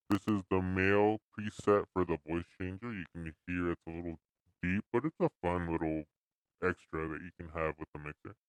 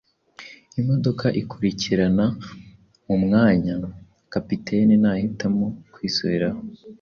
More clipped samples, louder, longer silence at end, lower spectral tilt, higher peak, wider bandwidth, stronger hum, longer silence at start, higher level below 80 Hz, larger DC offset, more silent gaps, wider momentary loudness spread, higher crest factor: neither; second, -35 LUFS vs -22 LUFS; about the same, 0.15 s vs 0.05 s; about the same, -7.5 dB/octave vs -7 dB/octave; second, -14 dBFS vs -6 dBFS; first, 15 kHz vs 6.8 kHz; neither; second, 0.1 s vs 0.4 s; second, -58 dBFS vs -50 dBFS; neither; first, 1.22-1.32 s, 6.17-6.45 s, 7.88-7.93 s vs none; second, 14 LU vs 18 LU; first, 22 dB vs 16 dB